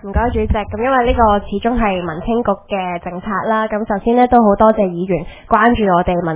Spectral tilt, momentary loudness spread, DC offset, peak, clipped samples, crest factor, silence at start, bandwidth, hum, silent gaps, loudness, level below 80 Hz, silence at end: -10.5 dB/octave; 9 LU; under 0.1%; 0 dBFS; under 0.1%; 14 dB; 0.05 s; 4 kHz; none; none; -15 LUFS; -28 dBFS; 0 s